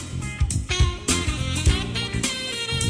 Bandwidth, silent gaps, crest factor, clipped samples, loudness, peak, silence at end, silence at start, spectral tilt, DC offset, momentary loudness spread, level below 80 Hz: 11 kHz; none; 16 dB; under 0.1%; -24 LUFS; -8 dBFS; 0 s; 0 s; -3.5 dB/octave; under 0.1%; 4 LU; -28 dBFS